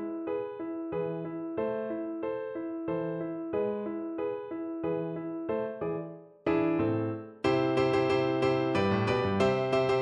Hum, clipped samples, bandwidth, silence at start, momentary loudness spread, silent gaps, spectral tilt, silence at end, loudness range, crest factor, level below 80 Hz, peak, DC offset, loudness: none; under 0.1%; 9.6 kHz; 0 s; 9 LU; none; -7.5 dB/octave; 0 s; 7 LU; 18 dB; -62 dBFS; -14 dBFS; under 0.1%; -31 LUFS